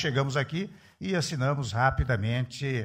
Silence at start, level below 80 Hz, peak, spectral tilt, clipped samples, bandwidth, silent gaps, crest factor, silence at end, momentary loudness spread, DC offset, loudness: 0 s; -42 dBFS; -10 dBFS; -5.5 dB/octave; under 0.1%; 10.5 kHz; none; 18 dB; 0 s; 8 LU; under 0.1%; -29 LUFS